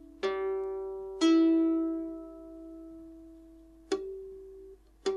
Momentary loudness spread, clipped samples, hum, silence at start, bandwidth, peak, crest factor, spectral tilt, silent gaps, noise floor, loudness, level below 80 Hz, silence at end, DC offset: 25 LU; under 0.1%; none; 0 s; 10.5 kHz; -16 dBFS; 16 dB; -4 dB/octave; none; -54 dBFS; -30 LUFS; -60 dBFS; 0 s; under 0.1%